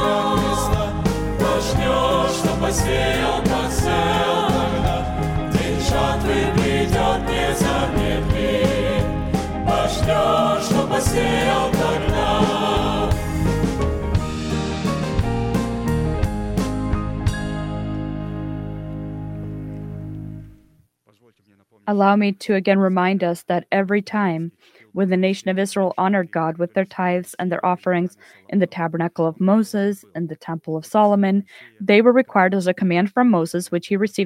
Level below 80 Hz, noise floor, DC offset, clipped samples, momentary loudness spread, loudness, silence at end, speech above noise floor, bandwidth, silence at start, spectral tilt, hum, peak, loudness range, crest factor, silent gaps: -32 dBFS; -59 dBFS; under 0.1%; under 0.1%; 11 LU; -20 LUFS; 0 s; 40 dB; 16.5 kHz; 0 s; -5.5 dB/octave; none; 0 dBFS; 6 LU; 18 dB; none